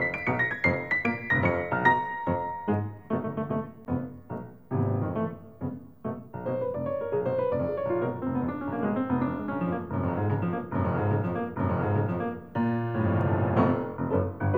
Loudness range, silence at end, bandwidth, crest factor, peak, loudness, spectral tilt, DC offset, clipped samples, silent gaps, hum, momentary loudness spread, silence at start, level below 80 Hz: 6 LU; 0 s; 16.5 kHz; 20 dB; -8 dBFS; -29 LUFS; -9.5 dB/octave; 0.2%; under 0.1%; none; none; 9 LU; 0 s; -56 dBFS